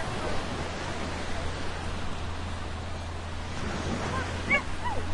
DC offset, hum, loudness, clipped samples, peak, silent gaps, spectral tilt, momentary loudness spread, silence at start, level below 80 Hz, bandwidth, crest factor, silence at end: under 0.1%; none; -33 LUFS; under 0.1%; -12 dBFS; none; -4.5 dB/octave; 10 LU; 0 s; -40 dBFS; 11.5 kHz; 18 dB; 0 s